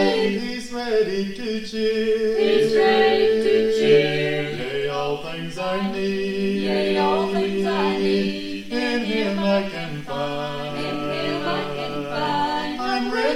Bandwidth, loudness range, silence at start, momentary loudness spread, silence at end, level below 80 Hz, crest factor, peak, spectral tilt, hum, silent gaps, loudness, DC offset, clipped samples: 14 kHz; 6 LU; 0 s; 10 LU; 0 s; -50 dBFS; 16 dB; -4 dBFS; -5.5 dB/octave; none; none; -22 LUFS; under 0.1%; under 0.1%